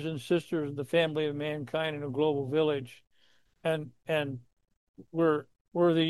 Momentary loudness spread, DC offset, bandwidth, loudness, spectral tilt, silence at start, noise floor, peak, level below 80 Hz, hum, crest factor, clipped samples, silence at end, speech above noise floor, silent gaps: 9 LU; under 0.1%; 12.5 kHz; -31 LUFS; -7 dB/octave; 0 s; -68 dBFS; -14 dBFS; -72 dBFS; none; 18 dB; under 0.1%; 0 s; 38 dB; 4.77-4.94 s, 5.61-5.65 s